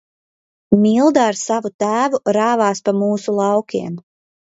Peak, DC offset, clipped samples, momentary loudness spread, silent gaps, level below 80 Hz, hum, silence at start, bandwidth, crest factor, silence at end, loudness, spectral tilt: 0 dBFS; under 0.1%; under 0.1%; 10 LU; 1.74-1.79 s; -58 dBFS; none; 0.7 s; 8 kHz; 16 dB; 0.55 s; -17 LUFS; -5.5 dB/octave